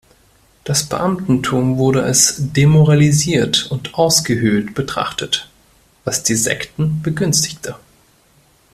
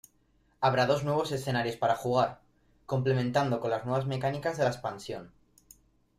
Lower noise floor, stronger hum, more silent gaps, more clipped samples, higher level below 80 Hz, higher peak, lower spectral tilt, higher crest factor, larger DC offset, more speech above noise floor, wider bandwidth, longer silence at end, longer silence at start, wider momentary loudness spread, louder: second, -53 dBFS vs -68 dBFS; neither; neither; neither; first, -46 dBFS vs -62 dBFS; first, 0 dBFS vs -12 dBFS; second, -4 dB/octave vs -6 dB/octave; about the same, 16 dB vs 18 dB; neither; about the same, 38 dB vs 39 dB; about the same, 14.5 kHz vs 15.5 kHz; about the same, 0.95 s vs 0.9 s; about the same, 0.65 s vs 0.6 s; about the same, 10 LU vs 9 LU; first, -15 LUFS vs -30 LUFS